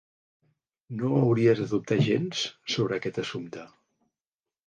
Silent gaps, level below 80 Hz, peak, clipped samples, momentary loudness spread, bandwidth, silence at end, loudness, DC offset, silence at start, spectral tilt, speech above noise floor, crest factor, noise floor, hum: none; -66 dBFS; -10 dBFS; under 0.1%; 15 LU; 9.4 kHz; 1 s; -26 LUFS; under 0.1%; 0.9 s; -6 dB/octave; over 64 dB; 18 dB; under -90 dBFS; none